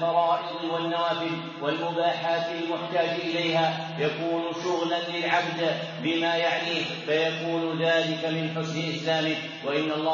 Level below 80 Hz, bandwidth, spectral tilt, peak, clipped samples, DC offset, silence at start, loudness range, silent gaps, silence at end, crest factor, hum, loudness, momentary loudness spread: -82 dBFS; 7.2 kHz; -3 dB/octave; -10 dBFS; under 0.1%; under 0.1%; 0 s; 1 LU; none; 0 s; 18 dB; none; -27 LUFS; 5 LU